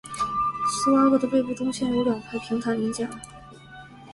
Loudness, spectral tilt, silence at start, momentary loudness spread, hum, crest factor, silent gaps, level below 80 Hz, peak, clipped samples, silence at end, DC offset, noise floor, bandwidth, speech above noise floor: -24 LUFS; -5 dB/octave; 0.05 s; 24 LU; none; 16 dB; none; -56 dBFS; -10 dBFS; under 0.1%; 0 s; under 0.1%; -45 dBFS; 11.5 kHz; 21 dB